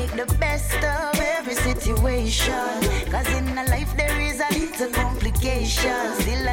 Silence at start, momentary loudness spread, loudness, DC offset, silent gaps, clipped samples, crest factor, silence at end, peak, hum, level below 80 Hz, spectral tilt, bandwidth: 0 s; 2 LU; -23 LUFS; under 0.1%; none; under 0.1%; 12 dB; 0 s; -10 dBFS; none; -26 dBFS; -4 dB/octave; 17 kHz